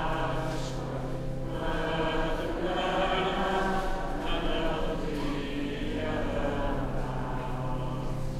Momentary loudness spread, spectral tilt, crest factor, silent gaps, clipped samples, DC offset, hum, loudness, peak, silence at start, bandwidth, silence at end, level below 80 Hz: 6 LU; -6 dB/octave; 14 dB; none; under 0.1%; under 0.1%; none; -32 LUFS; -14 dBFS; 0 s; 12.5 kHz; 0 s; -36 dBFS